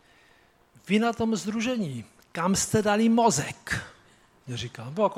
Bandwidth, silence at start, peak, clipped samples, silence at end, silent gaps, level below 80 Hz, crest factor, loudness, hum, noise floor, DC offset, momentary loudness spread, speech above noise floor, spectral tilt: 15.5 kHz; 0.85 s; -8 dBFS; under 0.1%; 0 s; none; -56 dBFS; 18 dB; -26 LUFS; none; -60 dBFS; under 0.1%; 14 LU; 35 dB; -4.5 dB/octave